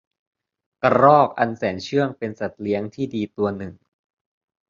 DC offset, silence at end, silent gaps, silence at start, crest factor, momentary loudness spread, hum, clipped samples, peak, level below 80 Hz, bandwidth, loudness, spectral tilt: under 0.1%; 0.95 s; none; 0.85 s; 20 dB; 14 LU; none; under 0.1%; -2 dBFS; -56 dBFS; 7.4 kHz; -21 LUFS; -7 dB/octave